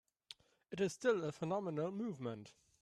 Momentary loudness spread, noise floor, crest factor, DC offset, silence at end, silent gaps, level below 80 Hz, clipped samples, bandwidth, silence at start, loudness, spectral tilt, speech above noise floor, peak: 21 LU; -62 dBFS; 18 dB; under 0.1%; 0.3 s; none; -80 dBFS; under 0.1%; 13 kHz; 0.3 s; -40 LUFS; -6 dB/octave; 22 dB; -24 dBFS